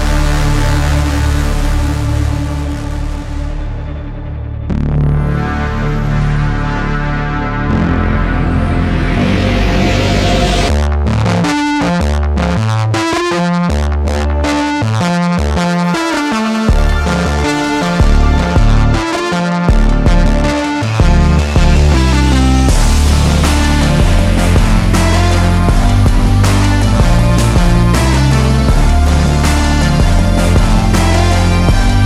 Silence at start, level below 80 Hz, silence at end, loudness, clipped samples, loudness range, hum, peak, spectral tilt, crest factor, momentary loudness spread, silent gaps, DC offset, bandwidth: 0 s; -14 dBFS; 0 s; -13 LUFS; under 0.1%; 5 LU; none; 0 dBFS; -6 dB/octave; 10 dB; 6 LU; none; under 0.1%; 14 kHz